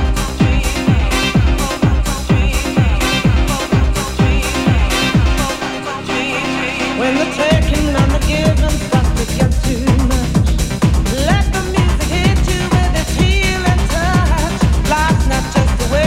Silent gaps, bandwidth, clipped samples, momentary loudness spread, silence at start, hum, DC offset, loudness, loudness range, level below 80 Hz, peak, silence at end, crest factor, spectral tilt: none; 16 kHz; under 0.1%; 3 LU; 0 s; none; under 0.1%; -15 LUFS; 1 LU; -18 dBFS; 0 dBFS; 0 s; 14 dB; -5 dB/octave